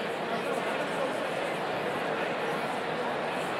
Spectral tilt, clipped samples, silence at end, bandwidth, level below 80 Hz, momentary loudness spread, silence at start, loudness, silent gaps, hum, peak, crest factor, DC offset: -4.5 dB/octave; under 0.1%; 0 s; 16.5 kHz; -70 dBFS; 1 LU; 0 s; -31 LUFS; none; none; -18 dBFS; 14 dB; under 0.1%